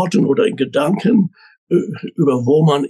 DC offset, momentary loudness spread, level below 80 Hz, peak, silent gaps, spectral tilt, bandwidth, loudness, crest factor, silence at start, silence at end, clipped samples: under 0.1%; 5 LU; -66 dBFS; -4 dBFS; 1.58-1.67 s; -7.5 dB/octave; 12.5 kHz; -16 LUFS; 12 dB; 0 s; 0 s; under 0.1%